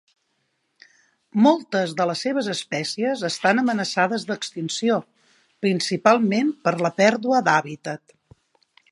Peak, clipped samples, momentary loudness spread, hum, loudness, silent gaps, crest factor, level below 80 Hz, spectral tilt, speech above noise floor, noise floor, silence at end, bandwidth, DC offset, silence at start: -2 dBFS; under 0.1%; 10 LU; none; -22 LUFS; none; 22 dB; -72 dBFS; -4.5 dB/octave; 50 dB; -72 dBFS; 0.95 s; 11.5 kHz; under 0.1%; 1.35 s